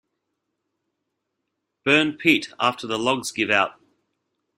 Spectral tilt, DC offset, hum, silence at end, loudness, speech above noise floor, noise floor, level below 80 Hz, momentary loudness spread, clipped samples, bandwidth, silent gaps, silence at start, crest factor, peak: -3.5 dB/octave; under 0.1%; none; 0.85 s; -21 LUFS; 58 dB; -79 dBFS; -66 dBFS; 6 LU; under 0.1%; 15.5 kHz; none; 1.85 s; 22 dB; -2 dBFS